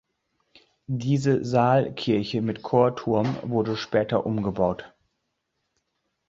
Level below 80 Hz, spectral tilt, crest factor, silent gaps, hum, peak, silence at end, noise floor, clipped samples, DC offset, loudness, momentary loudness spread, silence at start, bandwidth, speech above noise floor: -56 dBFS; -7.5 dB/octave; 20 dB; none; none; -6 dBFS; 1.4 s; -77 dBFS; under 0.1%; under 0.1%; -24 LUFS; 6 LU; 0.9 s; 7.8 kHz; 54 dB